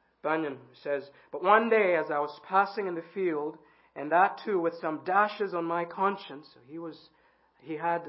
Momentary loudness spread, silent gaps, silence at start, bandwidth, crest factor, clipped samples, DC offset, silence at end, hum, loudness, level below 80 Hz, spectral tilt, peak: 18 LU; none; 0.25 s; 5.8 kHz; 22 dB; under 0.1%; under 0.1%; 0 s; none; -28 LUFS; -84 dBFS; -9 dB/octave; -8 dBFS